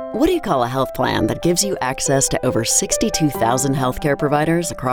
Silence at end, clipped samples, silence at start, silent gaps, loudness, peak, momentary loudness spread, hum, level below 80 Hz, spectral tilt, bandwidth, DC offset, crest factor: 0 s; under 0.1%; 0 s; none; -18 LUFS; -4 dBFS; 4 LU; none; -38 dBFS; -4 dB/octave; 19 kHz; under 0.1%; 14 dB